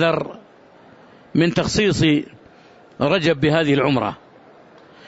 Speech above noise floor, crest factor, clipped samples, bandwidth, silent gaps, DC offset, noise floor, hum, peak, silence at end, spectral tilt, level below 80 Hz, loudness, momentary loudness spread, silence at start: 30 dB; 16 dB; under 0.1%; 8 kHz; none; under 0.1%; -48 dBFS; none; -6 dBFS; 0.95 s; -5.5 dB/octave; -46 dBFS; -19 LUFS; 11 LU; 0 s